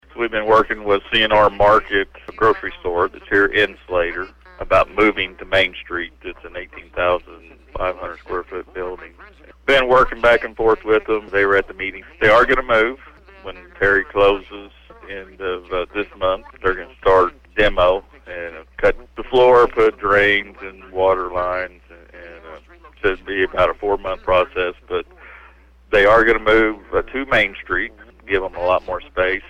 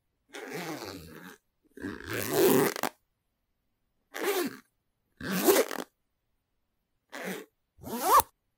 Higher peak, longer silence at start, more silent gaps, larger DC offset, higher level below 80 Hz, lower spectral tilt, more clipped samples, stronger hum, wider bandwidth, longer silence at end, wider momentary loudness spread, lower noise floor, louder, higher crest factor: about the same, -4 dBFS vs -6 dBFS; second, 0.15 s vs 0.35 s; neither; neither; first, -36 dBFS vs -66 dBFS; first, -5.5 dB/octave vs -3.5 dB/octave; neither; neither; second, 9.8 kHz vs 18 kHz; second, 0.1 s vs 0.35 s; second, 17 LU vs 22 LU; second, -47 dBFS vs -79 dBFS; first, -17 LUFS vs -28 LUFS; second, 16 dB vs 26 dB